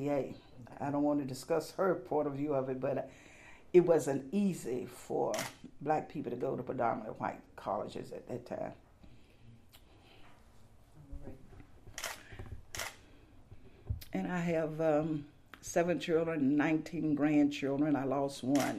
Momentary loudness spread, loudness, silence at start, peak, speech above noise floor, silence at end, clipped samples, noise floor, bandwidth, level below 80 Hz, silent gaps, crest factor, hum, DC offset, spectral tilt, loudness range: 18 LU; -35 LUFS; 0 s; -12 dBFS; 26 dB; 0 s; under 0.1%; -59 dBFS; 15 kHz; -58 dBFS; none; 22 dB; none; under 0.1%; -6 dB/octave; 16 LU